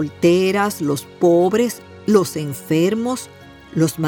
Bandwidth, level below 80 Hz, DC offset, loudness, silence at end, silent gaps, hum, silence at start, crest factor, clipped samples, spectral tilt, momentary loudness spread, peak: 18.5 kHz; -58 dBFS; under 0.1%; -18 LUFS; 0 s; none; none; 0 s; 16 dB; under 0.1%; -6 dB/octave; 12 LU; -2 dBFS